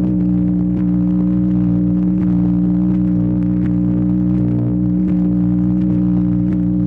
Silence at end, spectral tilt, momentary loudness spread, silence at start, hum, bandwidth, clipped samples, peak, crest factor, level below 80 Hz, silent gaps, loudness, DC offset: 0 s; -12.5 dB/octave; 1 LU; 0 s; 60 Hz at -20 dBFS; 2.8 kHz; under 0.1%; -8 dBFS; 6 dB; -32 dBFS; none; -16 LUFS; under 0.1%